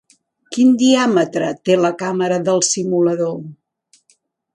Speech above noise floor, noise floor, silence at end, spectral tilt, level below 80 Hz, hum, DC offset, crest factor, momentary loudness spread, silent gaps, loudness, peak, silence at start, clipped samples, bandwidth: 45 dB; -60 dBFS; 1 s; -4.5 dB/octave; -66 dBFS; none; under 0.1%; 16 dB; 10 LU; none; -16 LUFS; -2 dBFS; 0.5 s; under 0.1%; 11 kHz